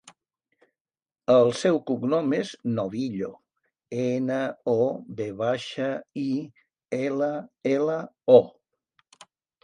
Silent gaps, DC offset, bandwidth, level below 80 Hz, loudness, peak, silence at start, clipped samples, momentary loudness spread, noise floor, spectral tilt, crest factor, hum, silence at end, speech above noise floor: none; under 0.1%; 10.5 kHz; -70 dBFS; -25 LUFS; -4 dBFS; 1.3 s; under 0.1%; 15 LU; under -90 dBFS; -6.5 dB/octave; 22 dB; none; 1.15 s; over 66 dB